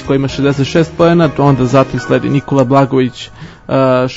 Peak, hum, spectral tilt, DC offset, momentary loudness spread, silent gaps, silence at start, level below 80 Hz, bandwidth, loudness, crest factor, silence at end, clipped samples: 0 dBFS; none; -7 dB/octave; under 0.1%; 8 LU; none; 0 s; -38 dBFS; 8 kHz; -12 LUFS; 12 dB; 0 s; 0.2%